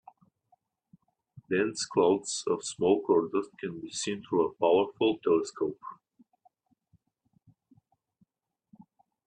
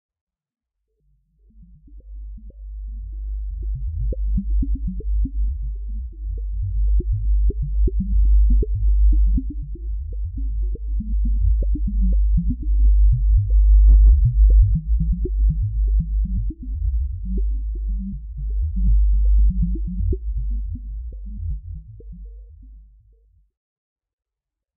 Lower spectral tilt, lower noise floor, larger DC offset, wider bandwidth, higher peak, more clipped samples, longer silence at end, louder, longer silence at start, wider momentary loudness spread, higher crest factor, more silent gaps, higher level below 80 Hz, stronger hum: second, -4 dB/octave vs -20 dB/octave; second, -81 dBFS vs -86 dBFS; neither; first, 10 kHz vs 0.6 kHz; second, -12 dBFS vs -6 dBFS; neither; first, 3.35 s vs 1.95 s; second, -29 LUFS vs -22 LUFS; second, 1.35 s vs 1.6 s; second, 10 LU vs 17 LU; first, 20 dB vs 14 dB; neither; second, -72 dBFS vs -20 dBFS; neither